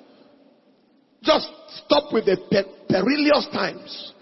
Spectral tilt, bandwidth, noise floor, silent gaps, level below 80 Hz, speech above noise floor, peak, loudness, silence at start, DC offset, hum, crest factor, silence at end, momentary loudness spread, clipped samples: -6 dB/octave; 6 kHz; -60 dBFS; none; -58 dBFS; 38 dB; -2 dBFS; -21 LUFS; 1.25 s; under 0.1%; none; 20 dB; 0.1 s; 15 LU; under 0.1%